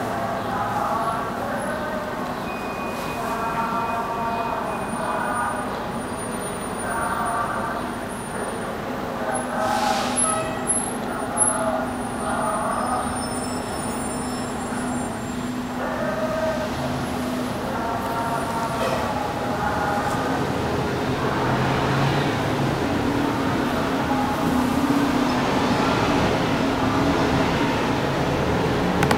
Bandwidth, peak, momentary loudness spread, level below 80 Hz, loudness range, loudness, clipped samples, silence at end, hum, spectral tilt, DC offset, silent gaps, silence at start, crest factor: 16 kHz; -2 dBFS; 7 LU; -44 dBFS; 5 LU; -24 LUFS; under 0.1%; 0 s; none; -4.5 dB/octave; under 0.1%; none; 0 s; 22 dB